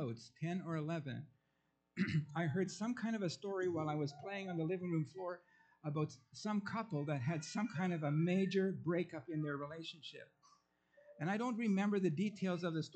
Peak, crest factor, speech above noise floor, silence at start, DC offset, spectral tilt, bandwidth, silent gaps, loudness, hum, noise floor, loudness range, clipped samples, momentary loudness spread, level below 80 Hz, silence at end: -24 dBFS; 16 dB; 43 dB; 0 s; under 0.1%; -6.5 dB/octave; 8.8 kHz; none; -40 LUFS; none; -82 dBFS; 3 LU; under 0.1%; 11 LU; -82 dBFS; 0.05 s